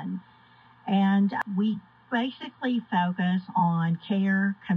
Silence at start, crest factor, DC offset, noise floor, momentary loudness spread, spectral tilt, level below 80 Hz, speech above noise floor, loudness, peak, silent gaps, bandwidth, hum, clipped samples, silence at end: 0 s; 14 dB; under 0.1%; -56 dBFS; 10 LU; -9 dB/octave; -76 dBFS; 30 dB; -27 LUFS; -12 dBFS; none; 5 kHz; none; under 0.1%; 0 s